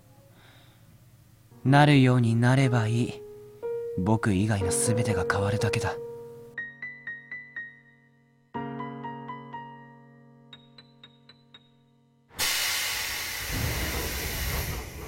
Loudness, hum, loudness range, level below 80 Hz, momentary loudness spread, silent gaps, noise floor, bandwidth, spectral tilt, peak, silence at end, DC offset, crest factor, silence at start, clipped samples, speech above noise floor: -26 LUFS; none; 17 LU; -46 dBFS; 18 LU; none; -63 dBFS; 16.5 kHz; -5 dB/octave; -8 dBFS; 0 s; under 0.1%; 20 dB; 1.55 s; under 0.1%; 40 dB